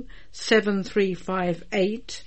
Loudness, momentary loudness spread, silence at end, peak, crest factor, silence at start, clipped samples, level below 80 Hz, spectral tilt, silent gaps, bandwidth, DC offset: -24 LUFS; 7 LU; 0.05 s; -8 dBFS; 18 dB; 0 s; under 0.1%; -52 dBFS; -5 dB/octave; none; 8.8 kHz; 1%